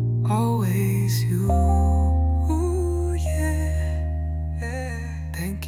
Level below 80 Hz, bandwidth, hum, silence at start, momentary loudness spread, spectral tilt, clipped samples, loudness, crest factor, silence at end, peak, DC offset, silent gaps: -28 dBFS; 16 kHz; none; 0 s; 9 LU; -7 dB/octave; under 0.1%; -23 LUFS; 12 dB; 0 s; -10 dBFS; under 0.1%; none